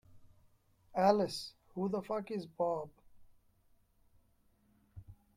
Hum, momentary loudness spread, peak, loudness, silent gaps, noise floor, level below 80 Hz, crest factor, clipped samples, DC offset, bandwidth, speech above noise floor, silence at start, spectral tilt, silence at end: none; 14 LU; -16 dBFS; -36 LUFS; none; -71 dBFS; -70 dBFS; 24 dB; under 0.1%; under 0.1%; 15.5 kHz; 37 dB; 0.15 s; -6 dB/octave; 0.25 s